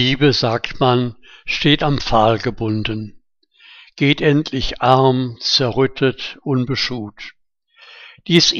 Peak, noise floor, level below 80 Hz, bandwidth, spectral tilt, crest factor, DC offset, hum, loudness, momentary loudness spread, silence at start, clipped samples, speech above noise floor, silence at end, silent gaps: 0 dBFS; -52 dBFS; -38 dBFS; 8 kHz; -5 dB/octave; 18 dB; under 0.1%; none; -17 LUFS; 14 LU; 0 s; under 0.1%; 36 dB; 0 s; none